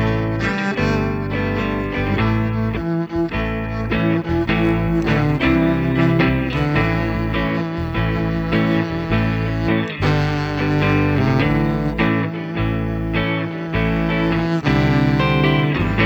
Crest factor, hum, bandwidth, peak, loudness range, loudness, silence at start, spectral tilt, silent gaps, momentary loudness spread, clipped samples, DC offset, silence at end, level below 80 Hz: 16 dB; none; over 20 kHz; -2 dBFS; 3 LU; -19 LUFS; 0 s; -8 dB/octave; none; 5 LU; under 0.1%; under 0.1%; 0 s; -30 dBFS